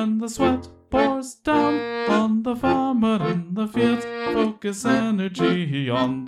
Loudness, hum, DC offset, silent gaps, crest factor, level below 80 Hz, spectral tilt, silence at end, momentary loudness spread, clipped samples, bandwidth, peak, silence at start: -22 LUFS; none; under 0.1%; none; 14 dB; -50 dBFS; -6 dB/octave; 0 s; 5 LU; under 0.1%; 13.5 kHz; -6 dBFS; 0 s